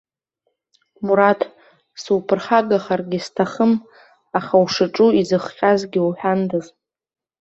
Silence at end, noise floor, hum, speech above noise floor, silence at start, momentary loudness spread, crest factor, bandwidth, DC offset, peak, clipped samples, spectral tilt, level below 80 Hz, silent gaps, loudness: 0.75 s; -73 dBFS; none; 55 dB; 1 s; 10 LU; 18 dB; 8 kHz; under 0.1%; -2 dBFS; under 0.1%; -6 dB/octave; -62 dBFS; none; -19 LUFS